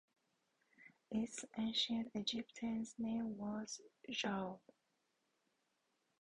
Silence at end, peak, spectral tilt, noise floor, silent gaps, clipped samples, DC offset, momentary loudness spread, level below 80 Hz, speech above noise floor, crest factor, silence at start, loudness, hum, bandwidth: 1.65 s; -26 dBFS; -3.5 dB/octave; -84 dBFS; none; under 0.1%; under 0.1%; 9 LU; -78 dBFS; 41 dB; 20 dB; 0.8 s; -43 LUFS; none; 10.5 kHz